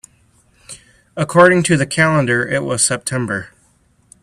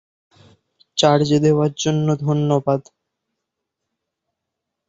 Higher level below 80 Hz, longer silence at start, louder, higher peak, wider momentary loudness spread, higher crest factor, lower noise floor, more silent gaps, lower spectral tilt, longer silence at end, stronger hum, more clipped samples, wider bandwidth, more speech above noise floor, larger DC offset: first, -52 dBFS vs -58 dBFS; second, 0.7 s vs 0.95 s; first, -15 LUFS vs -18 LUFS; about the same, 0 dBFS vs -2 dBFS; first, 23 LU vs 7 LU; about the same, 18 dB vs 20 dB; second, -56 dBFS vs -81 dBFS; neither; second, -4.5 dB/octave vs -6 dB/octave; second, 0.75 s vs 2.05 s; neither; neither; first, 14.5 kHz vs 8 kHz; second, 41 dB vs 64 dB; neither